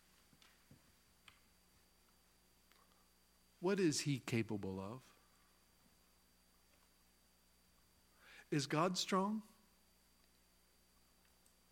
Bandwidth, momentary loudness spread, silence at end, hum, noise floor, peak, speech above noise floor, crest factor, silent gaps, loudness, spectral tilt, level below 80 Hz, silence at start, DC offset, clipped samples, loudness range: 16.5 kHz; 15 LU; 2.3 s; 60 Hz at -70 dBFS; -73 dBFS; -22 dBFS; 34 dB; 24 dB; none; -40 LUFS; -4.5 dB/octave; -80 dBFS; 3.6 s; under 0.1%; under 0.1%; 9 LU